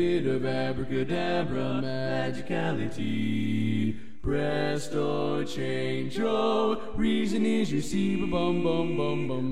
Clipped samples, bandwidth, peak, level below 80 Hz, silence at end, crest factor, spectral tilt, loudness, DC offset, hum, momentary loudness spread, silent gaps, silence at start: under 0.1%; 13.5 kHz; -14 dBFS; -48 dBFS; 0 s; 14 dB; -6.5 dB/octave; -28 LUFS; 2%; none; 5 LU; none; 0 s